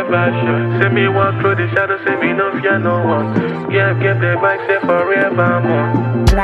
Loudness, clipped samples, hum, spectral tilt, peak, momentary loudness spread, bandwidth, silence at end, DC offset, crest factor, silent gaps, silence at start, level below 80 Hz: -15 LUFS; under 0.1%; none; -7.5 dB/octave; 0 dBFS; 3 LU; 11.5 kHz; 0 s; under 0.1%; 14 dB; none; 0 s; -28 dBFS